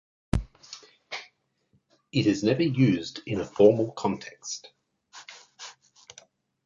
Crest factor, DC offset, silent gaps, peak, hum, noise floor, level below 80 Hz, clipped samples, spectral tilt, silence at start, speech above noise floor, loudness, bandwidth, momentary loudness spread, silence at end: 22 dB; under 0.1%; none; -6 dBFS; none; -70 dBFS; -48 dBFS; under 0.1%; -6 dB/octave; 0.35 s; 45 dB; -26 LUFS; 10.5 kHz; 24 LU; 0.95 s